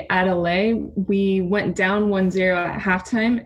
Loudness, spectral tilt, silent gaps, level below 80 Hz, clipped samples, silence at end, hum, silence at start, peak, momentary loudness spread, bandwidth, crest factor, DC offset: -20 LUFS; -6.5 dB/octave; none; -46 dBFS; under 0.1%; 0 s; none; 0 s; -4 dBFS; 3 LU; 9.6 kHz; 16 dB; under 0.1%